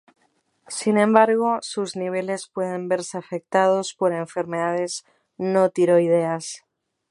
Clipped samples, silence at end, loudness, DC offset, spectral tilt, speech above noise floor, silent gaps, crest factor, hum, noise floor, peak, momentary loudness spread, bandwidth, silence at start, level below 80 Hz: under 0.1%; 0.55 s; -22 LUFS; under 0.1%; -5 dB/octave; 46 dB; none; 22 dB; none; -67 dBFS; 0 dBFS; 13 LU; 11.5 kHz; 0.7 s; -74 dBFS